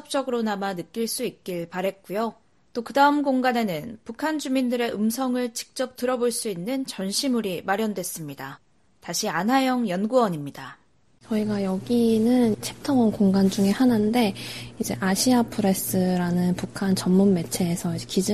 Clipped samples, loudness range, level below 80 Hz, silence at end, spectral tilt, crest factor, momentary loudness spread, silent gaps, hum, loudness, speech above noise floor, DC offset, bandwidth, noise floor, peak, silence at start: under 0.1%; 4 LU; -58 dBFS; 0 s; -5 dB/octave; 18 dB; 11 LU; none; none; -24 LUFS; 33 dB; under 0.1%; 13.5 kHz; -57 dBFS; -6 dBFS; 0.1 s